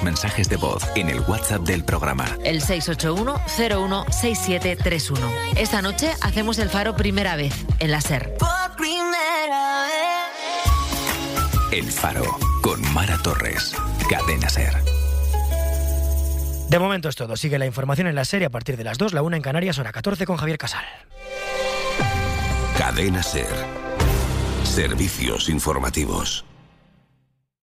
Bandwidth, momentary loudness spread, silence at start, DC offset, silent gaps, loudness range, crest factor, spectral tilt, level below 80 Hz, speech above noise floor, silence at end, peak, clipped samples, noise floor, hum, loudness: 16 kHz; 4 LU; 0 s; under 0.1%; none; 2 LU; 16 dB; -4.5 dB/octave; -28 dBFS; 44 dB; 1.1 s; -6 dBFS; under 0.1%; -65 dBFS; none; -22 LUFS